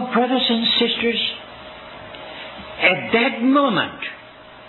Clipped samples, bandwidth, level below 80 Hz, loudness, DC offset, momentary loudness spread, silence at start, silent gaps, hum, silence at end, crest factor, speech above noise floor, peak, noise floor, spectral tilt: under 0.1%; 4.3 kHz; -56 dBFS; -18 LUFS; under 0.1%; 20 LU; 0 s; none; none; 0 s; 18 dB; 23 dB; -4 dBFS; -42 dBFS; -6.5 dB/octave